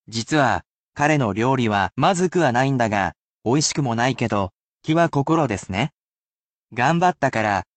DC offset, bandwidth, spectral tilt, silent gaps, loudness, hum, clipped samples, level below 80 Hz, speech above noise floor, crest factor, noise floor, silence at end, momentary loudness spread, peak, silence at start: under 0.1%; 9 kHz; -5 dB/octave; 0.66-0.93 s, 3.18-3.39 s, 4.62-4.75 s, 5.92-6.68 s; -21 LUFS; none; under 0.1%; -52 dBFS; over 70 dB; 16 dB; under -90 dBFS; 0.15 s; 8 LU; -4 dBFS; 0.1 s